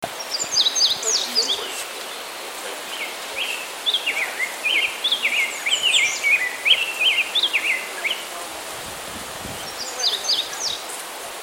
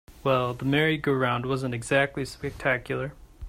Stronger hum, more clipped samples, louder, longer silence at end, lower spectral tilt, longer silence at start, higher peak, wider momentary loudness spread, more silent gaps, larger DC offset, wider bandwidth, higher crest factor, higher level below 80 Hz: neither; neither; first, -21 LUFS vs -26 LUFS; about the same, 0 s vs 0 s; second, 1.5 dB/octave vs -6 dB/octave; about the same, 0 s vs 0.1 s; first, -4 dBFS vs -10 dBFS; first, 14 LU vs 9 LU; neither; neither; about the same, 16.5 kHz vs 15.5 kHz; about the same, 20 dB vs 18 dB; second, -60 dBFS vs -50 dBFS